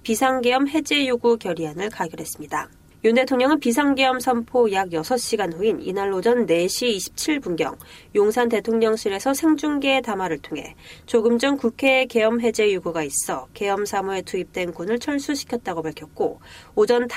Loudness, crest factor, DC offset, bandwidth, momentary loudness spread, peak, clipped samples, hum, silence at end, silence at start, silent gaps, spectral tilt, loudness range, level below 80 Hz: -22 LUFS; 16 dB; under 0.1%; 16 kHz; 10 LU; -6 dBFS; under 0.1%; none; 0 s; 0.05 s; none; -3.5 dB/octave; 4 LU; -56 dBFS